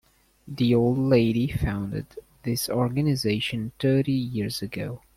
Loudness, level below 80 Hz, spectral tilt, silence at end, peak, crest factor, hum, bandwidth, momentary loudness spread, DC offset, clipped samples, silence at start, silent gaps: -25 LUFS; -48 dBFS; -6.5 dB/octave; 0.2 s; -8 dBFS; 16 dB; none; 16 kHz; 12 LU; under 0.1%; under 0.1%; 0.45 s; none